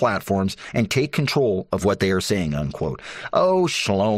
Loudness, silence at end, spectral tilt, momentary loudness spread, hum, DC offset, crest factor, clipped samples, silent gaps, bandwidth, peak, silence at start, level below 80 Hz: -22 LUFS; 0 s; -5.5 dB/octave; 7 LU; none; under 0.1%; 16 dB; under 0.1%; none; 14 kHz; -6 dBFS; 0 s; -48 dBFS